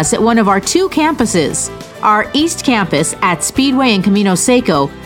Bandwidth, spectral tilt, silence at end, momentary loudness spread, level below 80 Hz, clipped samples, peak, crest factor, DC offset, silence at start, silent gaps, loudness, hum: 17.5 kHz; -4 dB/octave; 0 s; 4 LU; -40 dBFS; under 0.1%; 0 dBFS; 12 dB; under 0.1%; 0 s; none; -12 LUFS; none